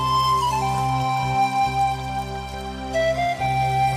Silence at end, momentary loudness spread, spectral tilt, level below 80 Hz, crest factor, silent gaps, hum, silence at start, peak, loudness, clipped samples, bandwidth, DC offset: 0 s; 10 LU; -5 dB/octave; -40 dBFS; 10 dB; none; none; 0 s; -12 dBFS; -22 LUFS; under 0.1%; 15.5 kHz; under 0.1%